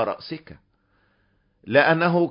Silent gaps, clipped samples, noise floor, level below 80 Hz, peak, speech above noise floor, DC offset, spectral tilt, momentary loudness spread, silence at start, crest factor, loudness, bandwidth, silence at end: none; under 0.1%; -66 dBFS; -62 dBFS; -2 dBFS; 44 dB; under 0.1%; -10.5 dB/octave; 19 LU; 0 s; 22 dB; -20 LUFS; 5.4 kHz; 0 s